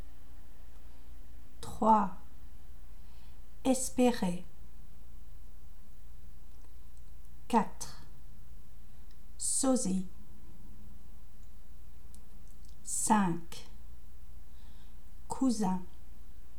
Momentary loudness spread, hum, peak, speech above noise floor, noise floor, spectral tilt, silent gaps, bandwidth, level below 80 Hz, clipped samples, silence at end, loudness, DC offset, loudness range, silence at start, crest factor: 28 LU; none; -12 dBFS; 24 dB; -54 dBFS; -4.5 dB/octave; none; over 20 kHz; -54 dBFS; under 0.1%; 0.2 s; -32 LUFS; 2%; 7 LU; 0 s; 24 dB